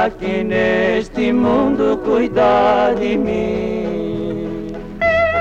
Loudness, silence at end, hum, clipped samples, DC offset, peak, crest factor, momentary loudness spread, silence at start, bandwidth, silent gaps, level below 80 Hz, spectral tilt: -17 LUFS; 0 s; none; under 0.1%; under 0.1%; -4 dBFS; 12 dB; 9 LU; 0 s; 8.6 kHz; none; -38 dBFS; -7 dB/octave